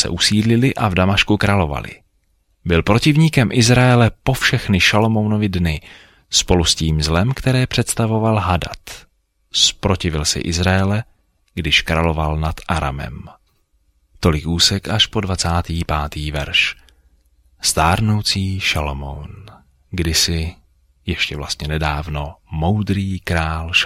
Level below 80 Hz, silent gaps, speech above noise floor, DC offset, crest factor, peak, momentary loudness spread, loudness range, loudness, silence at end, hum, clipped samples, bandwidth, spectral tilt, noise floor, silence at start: -32 dBFS; none; 45 dB; under 0.1%; 18 dB; 0 dBFS; 14 LU; 6 LU; -17 LUFS; 0 s; none; under 0.1%; 16 kHz; -4 dB/octave; -62 dBFS; 0 s